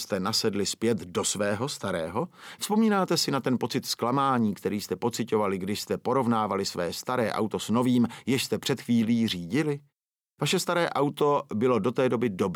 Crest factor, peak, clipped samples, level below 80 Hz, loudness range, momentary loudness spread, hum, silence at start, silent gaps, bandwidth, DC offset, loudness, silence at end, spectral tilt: 16 dB; -12 dBFS; under 0.1%; -68 dBFS; 1 LU; 6 LU; none; 0 s; none; 17.5 kHz; under 0.1%; -27 LUFS; 0 s; -4.5 dB/octave